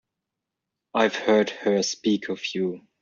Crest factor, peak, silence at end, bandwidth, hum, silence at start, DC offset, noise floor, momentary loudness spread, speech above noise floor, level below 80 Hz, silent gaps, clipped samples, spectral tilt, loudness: 20 dB; -6 dBFS; 0.25 s; 7.6 kHz; none; 0.95 s; under 0.1%; -85 dBFS; 8 LU; 61 dB; -70 dBFS; none; under 0.1%; -3.5 dB/octave; -24 LUFS